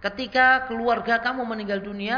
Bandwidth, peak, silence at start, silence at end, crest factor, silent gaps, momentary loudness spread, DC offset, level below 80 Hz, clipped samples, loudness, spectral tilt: 5.4 kHz; -6 dBFS; 0 s; 0 s; 18 dB; none; 11 LU; under 0.1%; -54 dBFS; under 0.1%; -22 LUFS; -5.5 dB/octave